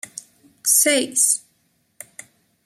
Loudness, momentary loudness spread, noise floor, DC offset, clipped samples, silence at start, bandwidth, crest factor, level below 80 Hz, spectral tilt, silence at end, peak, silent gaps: -17 LUFS; 24 LU; -66 dBFS; under 0.1%; under 0.1%; 0.65 s; 16 kHz; 20 dB; -76 dBFS; 0.5 dB/octave; 1.25 s; -2 dBFS; none